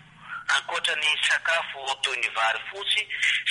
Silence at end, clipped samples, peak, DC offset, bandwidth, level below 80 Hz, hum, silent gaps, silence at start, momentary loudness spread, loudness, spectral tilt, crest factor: 0 s; under 0.1%; -10 dBFS; under 0.1%; 11.5 kHz; -70 dBFS; none; none; 0.2 s; 7 LU; -24 LUFS; 1.5 dB/octave; 18 dB